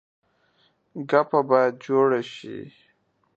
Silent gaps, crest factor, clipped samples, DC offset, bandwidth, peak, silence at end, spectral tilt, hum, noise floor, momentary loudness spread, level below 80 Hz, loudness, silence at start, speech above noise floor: none; 22 dB; under 0.1%; under 0.1%; 7.8 kHz; -4 dBFS; 0.7 s; -7 dB/octave; none; -67 dBFS; 18 LU; -76 dBFS; -22 LUFS; 0.95 s; 45 dB